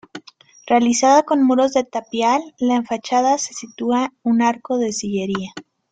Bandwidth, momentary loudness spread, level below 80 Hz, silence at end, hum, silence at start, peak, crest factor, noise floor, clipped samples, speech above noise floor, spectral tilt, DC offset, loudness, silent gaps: 9.2 kHz; 12 LU; -62 dBFS; 0.3 s; none; 0.15 s; -2 dBFS; 16 dB; -45 dBFS; under 0.1%; 27 dB; -4 dB/octave; under 0.1%; -18 LUFS; none